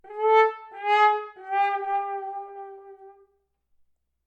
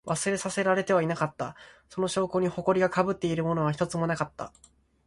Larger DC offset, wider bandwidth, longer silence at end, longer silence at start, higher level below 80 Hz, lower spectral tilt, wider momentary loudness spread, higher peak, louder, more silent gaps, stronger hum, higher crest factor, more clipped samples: neither; second, 8 kHz vs 11.5 kHz; first, 1.15 s vs 0.6 s; about the same, 0.05 s vs 0.05 s; second, -80 dBFS vs -60 dBFS; second, -1 dB/octave vs -5.5 dB/octave; first, 18 LU vs 12 LU; about the same, -8 dBFS vs -10 dBFS; first, -24 LUFS vs -28 LUFS; neither; neither; about the same, 18 dB vs 18 dB; neither